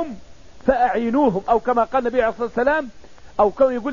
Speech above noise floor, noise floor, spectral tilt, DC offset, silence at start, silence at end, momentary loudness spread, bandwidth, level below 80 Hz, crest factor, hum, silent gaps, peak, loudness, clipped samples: 25 dB; -44 dBFS; -7 dB/octave; 0.9%; 0 s; 0 s; 11 LU; 7.4 kHz; -44 dBFS; 16 dB; none; none; -4 dBFS; -20 LUFS; under 0.1%